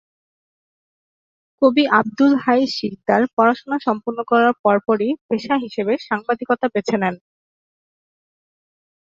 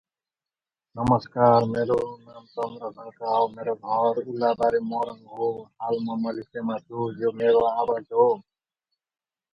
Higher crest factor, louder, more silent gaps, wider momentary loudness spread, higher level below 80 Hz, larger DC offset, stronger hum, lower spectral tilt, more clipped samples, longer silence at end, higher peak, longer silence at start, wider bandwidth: about the same, 18 dB vs 22 dB; first, -18 LUFS vs -25 LUFS; first, 3.33-3.37 s, 4.59-4.64 s, 5.21-5.29 s vs none; second, 7 LU vs 13 LU; second, -64 dBFS vs -58 dBFS; neither; neither; second, -6 dB/octave vs -8 dB/octave; neither; first, 2 s vs 1.1 s; about the same, -2 dBFS vs -4 dBFS; first, 1.6 s vs 0.95 s; first, 7.6 kHz vs 6 kHz